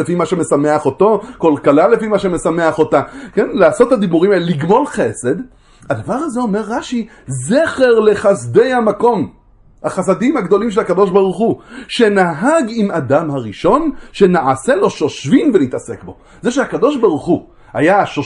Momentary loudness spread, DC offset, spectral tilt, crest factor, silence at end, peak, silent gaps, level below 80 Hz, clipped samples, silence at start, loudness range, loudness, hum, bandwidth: 10 LU; under 0.1%; -6 dB/octave; 14 dB; 0 s; 0 dBFS; none; -46 dBFS; under 0.1%; 0 s; 2 LU; -14 LUFS; none; 11.5 kHz